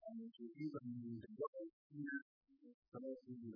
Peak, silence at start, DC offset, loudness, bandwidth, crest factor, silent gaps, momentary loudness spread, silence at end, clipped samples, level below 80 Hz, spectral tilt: -34 dBFS; 0 s; under 0.1%; -51 LUFS; 5 kHz; 16 dB; 1.48-1.53 s, 1.73-1.90 s, 2.22-2.41 s, 2.74-2.82 s, 2.88-2.92 s; 19 LU; 0 s; under 0.1%; -90 dBFS; -7 dB/octave